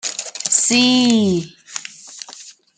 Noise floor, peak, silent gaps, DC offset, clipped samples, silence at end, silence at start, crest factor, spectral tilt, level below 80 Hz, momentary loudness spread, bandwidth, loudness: -41 dBFS; -2 dBFS; none; under 0.1%; under 0.1%; 0.25 s; 0.05 s; 18 dB; -2.5 dB/octave; -60 dBFS; 21 LU; 9.6 kHz; -15 LUFS